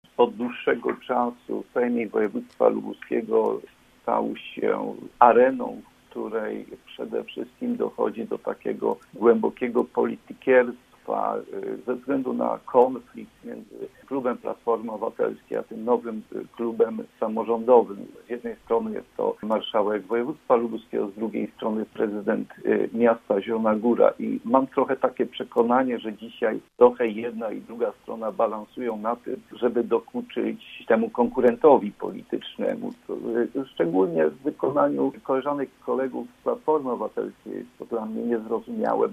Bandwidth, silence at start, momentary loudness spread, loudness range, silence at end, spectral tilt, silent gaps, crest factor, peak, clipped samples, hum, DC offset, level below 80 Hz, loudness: 3.9 kHz; 0.2 s; 13 LU; 5 LU; 0 s; -7.5 dB/octave; none; 24 dB; 0 dBFS; under 0.1%; none; under 0.1%; -66 dBFS; -25 LUFS